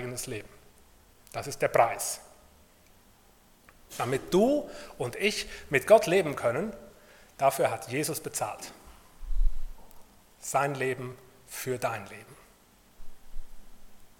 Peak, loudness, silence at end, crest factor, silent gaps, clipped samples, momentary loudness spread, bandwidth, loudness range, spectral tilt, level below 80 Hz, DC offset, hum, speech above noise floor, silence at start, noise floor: -8 dBFS; -29 LUFS; 0.1 s; 24 dB; none; under 0.1%; 18 LU; 18 kHz; 8 LU; -4 dB/octave; -40 dBFS; under 0.1%; none; 31 dB; 0 s; -59 dBFS